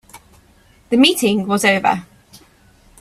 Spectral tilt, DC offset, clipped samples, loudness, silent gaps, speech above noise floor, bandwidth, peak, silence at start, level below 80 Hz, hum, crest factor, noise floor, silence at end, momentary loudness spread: -3.5 dB/octave; under 0.1%; under 0.1%; -15 LUFS; none; 36 dB; 16 kHz; 0 dBFS; 0.15 s; -54 dBFS; none; 18 dB; -51 dBFS; 1 s; 7 LU